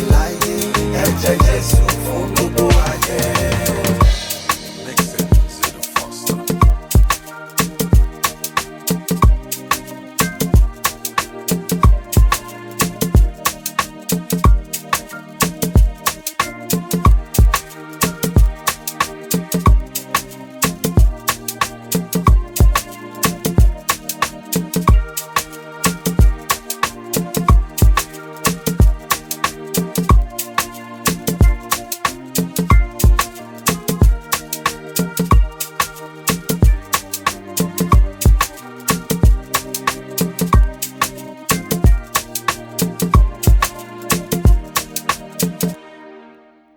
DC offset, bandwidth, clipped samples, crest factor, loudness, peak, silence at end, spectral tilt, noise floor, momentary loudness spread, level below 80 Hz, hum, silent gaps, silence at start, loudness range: under 0.1%; 19.5 kHz; under 0.1%; 16 dB; -17 LUFS; 0 dBFS; 0.55 s; -4.5 dB/octave; -46 dBFS; 6 LU; -18 dBFS; none; none; 0 s; 2 LU